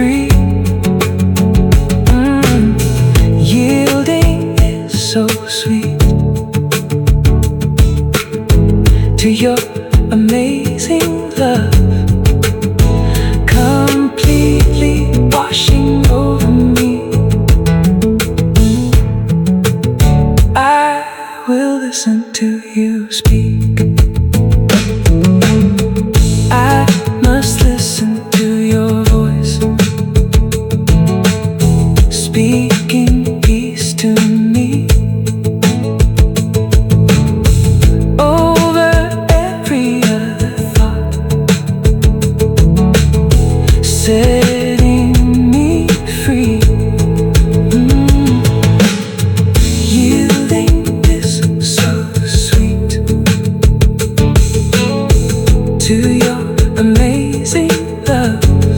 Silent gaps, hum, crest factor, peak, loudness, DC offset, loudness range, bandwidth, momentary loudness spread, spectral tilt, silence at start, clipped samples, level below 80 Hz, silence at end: none; none; 10 dB; 0 dBFS; -11 LUFS; under 0.1%; 2 LU; 18 kHz; 5 LU; -6 dB/octave; 0 s; under 0.1%; -16 dBFS; 0 s